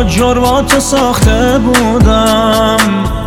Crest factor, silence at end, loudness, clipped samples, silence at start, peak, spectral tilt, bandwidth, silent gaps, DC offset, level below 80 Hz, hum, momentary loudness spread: 10 dB; 0 s; -9 LUFS; under 0.1%; 0 s; 0 dBFS; -4.5 dB/octave; 19 kHz; none; under 0.1%; -18 dBFS; none; 2 LU